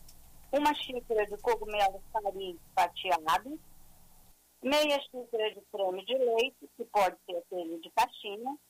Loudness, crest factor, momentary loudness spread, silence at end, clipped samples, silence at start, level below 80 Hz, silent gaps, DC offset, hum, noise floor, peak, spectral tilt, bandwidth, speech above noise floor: -32 LUFS; 14 dB; 10 LU; 0.15 s; under 0.1%; 0.05 s; -58 dBFS; none; under 0.1%; none; -60 dBFS; -18 dBFS; -2.5 dB/octave; 16 kHz; 28 dB